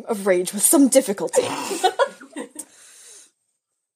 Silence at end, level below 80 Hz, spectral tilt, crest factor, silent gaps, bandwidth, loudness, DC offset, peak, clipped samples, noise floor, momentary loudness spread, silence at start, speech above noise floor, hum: 0.8 s; -76 dBFS; -3 dB/octave; 20 dB; none; 15.5 kHz; -19 LUFS; under 0.1%; -2 dBFS; under 0.1%; -76 dBFS; 20 LU; 0 s; 57 dB; none